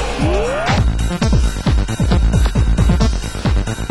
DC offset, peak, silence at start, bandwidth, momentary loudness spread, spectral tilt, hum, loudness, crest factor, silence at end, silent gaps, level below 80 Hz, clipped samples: under 0.1%; 0 dBFS; 0 s; 12 kHz; 4 LU; -6 dB/octave; none; -17 LUFS; 14 dB; 0 s; none; -16 dBFS; under 0.1%